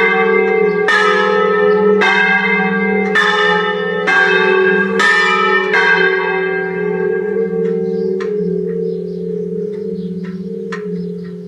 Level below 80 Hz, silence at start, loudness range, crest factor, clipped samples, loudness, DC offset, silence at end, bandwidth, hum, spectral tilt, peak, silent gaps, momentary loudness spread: -60 dBFS; 0 s; 8 LU; 14 dB; under 0.1%; -13 LUFS; under 0.1%; 0 s; 10.5 kHz; none; -5.5 dB/octave; 0 dBFS; none; 12 LU